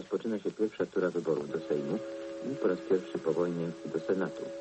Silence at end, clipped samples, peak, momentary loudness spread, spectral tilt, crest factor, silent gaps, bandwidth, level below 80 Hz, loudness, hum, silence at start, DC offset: 0 s; under 0.1%; -16 dBFS; 6 LU; -7 dB/octave; 16 dB; none; 8.4 kHz; -74 dBFS; -33 LUFS; none; 0 s; under 0.1%